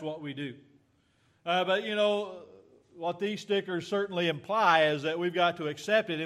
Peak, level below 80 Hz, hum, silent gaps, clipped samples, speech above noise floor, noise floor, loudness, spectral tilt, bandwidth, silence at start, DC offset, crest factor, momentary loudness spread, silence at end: -10 dBFS; -78 dBFS; none; none; under 0.1%; 39 dB; -68 dBFS; -29 LUFS; -5 dB/octave; 14 kHz; 0 s; under 0.1%; 20 dB; 14 LU; 0 s